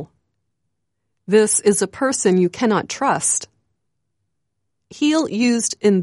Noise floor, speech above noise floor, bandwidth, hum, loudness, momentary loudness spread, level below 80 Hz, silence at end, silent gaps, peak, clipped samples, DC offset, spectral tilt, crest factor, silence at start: -77 dBFS; 60 dB; 11.5 kHz; none; -18 LUFS; 5 LU; -64 dBFS; 0 s; none; -4 dBFS; under 0.1%; under 0.1%; -4 dB/octave; 16 dB; 0 s